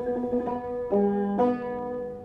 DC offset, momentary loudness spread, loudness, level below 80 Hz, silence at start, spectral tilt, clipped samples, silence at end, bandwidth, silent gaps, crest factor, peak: under 0.1%; 8 LU; -27 LUFS; -54 dBFS; 0 s; -10 dB/octave; under 0.1%; 0 s; 5.2 kHz; none; 14 dB; -12 dBFS